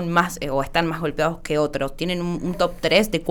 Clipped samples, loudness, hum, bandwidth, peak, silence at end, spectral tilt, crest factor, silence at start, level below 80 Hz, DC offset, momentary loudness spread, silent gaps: under 0.1%; -22 LUFS; none; over 20 kHz; -4 dBFS; 0 s; -5 dB/octave; 18 dB; 0 s; -40 dBFS; under 0.1%; 7 LU; none